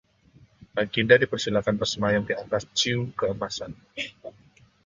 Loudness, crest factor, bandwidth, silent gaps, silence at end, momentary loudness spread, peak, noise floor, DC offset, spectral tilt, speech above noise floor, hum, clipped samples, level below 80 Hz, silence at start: -25 LUFS; 24 dB; 7.6 kHz; none; 0.55 s; 16 LU; -4 dBFS; -58 dBFS; under 0.1%; -4 dB/octave; 33 dB; none; under 0.1%; -56 dBFS; 0.75 s